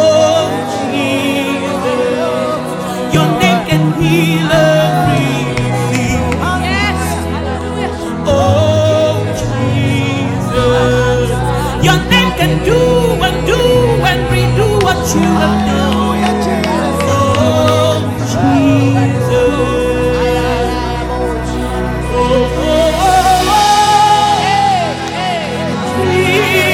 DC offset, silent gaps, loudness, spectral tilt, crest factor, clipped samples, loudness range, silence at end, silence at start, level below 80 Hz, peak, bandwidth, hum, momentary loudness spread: under 0.1%; none; -12 LUFS; -5.5 dB/octave; 12 dB; under 0.1%; 3 LU; 0 s; 0 s; -26 dBFS; 0 dBFS; 17 kHz; none; 7 LU